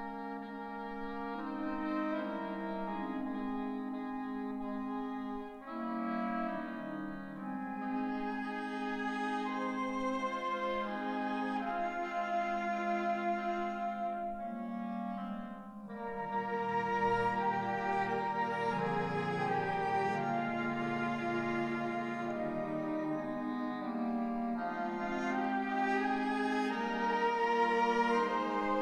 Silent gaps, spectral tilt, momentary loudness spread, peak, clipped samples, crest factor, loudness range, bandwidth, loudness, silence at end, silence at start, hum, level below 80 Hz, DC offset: none; -6.5 dB/octave; 9 LU; -20 dBFS; under 0.1%; 16 dB; 5 LU; 11 kHz; -36 LUFS; 0 s; 0 s; none; -64 dBFS; under 0.1%